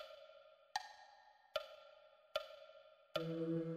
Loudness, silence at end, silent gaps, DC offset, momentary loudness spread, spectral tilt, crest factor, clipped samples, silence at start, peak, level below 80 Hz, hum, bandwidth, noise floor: -47 LUFS; 0 s; none; under 0.1%; 22 LU; -5.5 dB/octave; 22 dB; under 0.1%; 0 s; -26 dBFS; -82 dBFS; none; 15.5 kHz; -67 dBFS